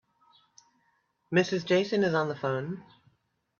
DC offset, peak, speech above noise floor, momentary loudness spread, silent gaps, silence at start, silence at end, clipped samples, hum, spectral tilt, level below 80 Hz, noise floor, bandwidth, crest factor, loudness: under 0.1%; -12 dBFS; 45 dB; 10 LU; none; 1.3 s; 0.8 s; under 0.1%; none; -6 dB/octave; -72 dBFS; -73 dBFS; 7.2 kHz; 20 dB; -28 LUFS